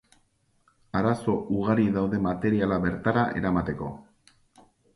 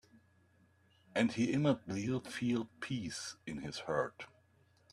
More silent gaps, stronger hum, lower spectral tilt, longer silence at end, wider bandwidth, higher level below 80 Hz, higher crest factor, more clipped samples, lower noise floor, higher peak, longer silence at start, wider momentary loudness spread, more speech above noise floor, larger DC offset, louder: neither; neither; first, -8.5 dB/octave vs -5.5 dB/octave; first, 0.95 s vs 0.65 s; second, 11.5 kHz vs 13 kHz; first, -50 dBFS vs -70 dBFS; about the same, 20 dB vs 22 dB; neither; about the same, -67 dBFS vs -70 dBFS; first, -8 dBFS vs -18 dBFS; second, 0.95 s vs 1.15 s; about the same, 9 LU vs 11 LU; first, 42 dB vs 33 dB; neither; first, -26 LUFS vs -37 LUFS